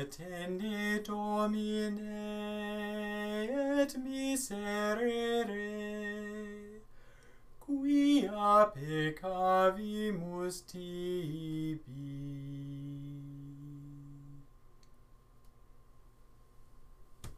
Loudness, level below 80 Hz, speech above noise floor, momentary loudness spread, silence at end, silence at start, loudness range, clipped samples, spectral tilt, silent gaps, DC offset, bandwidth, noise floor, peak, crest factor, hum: -34 LUFS; -60 dBFS; 25 dB; 19 LU; 0 s; 0 s; 16 LU; under 0.1%; -5.5 dB/octave; none; under 0.1%; 15.5 kHz; -59 dBFS; -16 dBFS; 20 dB; none